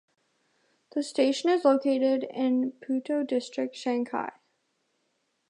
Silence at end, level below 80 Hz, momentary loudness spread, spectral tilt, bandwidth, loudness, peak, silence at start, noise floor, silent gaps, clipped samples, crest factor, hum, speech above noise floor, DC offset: 1.2 s; -86 dBFS; 10 LU; -4 dB/octave; 11 kHz; -27 LUFS; -10 dBFS; 0.95 s; -75 dBFS; none; under 0.1%; 20 dB; none; 49 dB; under 0.1%